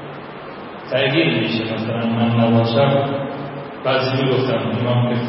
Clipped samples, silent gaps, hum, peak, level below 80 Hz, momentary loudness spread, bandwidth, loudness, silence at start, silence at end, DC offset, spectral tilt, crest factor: under 0.1%; none; none; -4 dBFS; -56 dBFS; 17 LU; 5.8 kHz; -18 LUFS; 0 s; 0 s; under 0.1%; -11 dB/octave; 16 dB